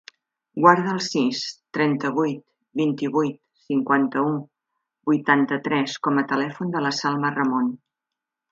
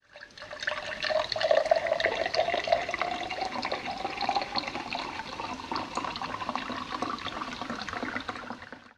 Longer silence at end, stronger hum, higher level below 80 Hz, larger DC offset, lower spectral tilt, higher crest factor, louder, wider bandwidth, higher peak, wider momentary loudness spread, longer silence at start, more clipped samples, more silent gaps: first, 0.75 s vs 0.1 s; neither; second, -72 dBFS vs -58 dBFS; neither; first, -5.5 dB/octave vs -3 dB/octave; about the same, 22 dB vs 24 dB; first, -22 LUFS vs -31 LUFS; second, 7.8 kHz vs 11.5 kHz; first, 0 dBFS vs -8 dBFS; about the same, 10 LU vs 10 LU; first, 0.55 s vs 0.15 s; neither; neither